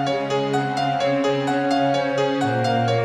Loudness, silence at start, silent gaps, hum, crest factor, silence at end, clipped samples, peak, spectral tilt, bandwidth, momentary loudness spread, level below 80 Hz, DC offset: -21 LUFS; 0 s; none; none; 12 dB; 0 s; under 0.1%; -8 dBFS; -6 dB/octave; 12 kHz; 2 LU; -62 dBFS; under 0.1%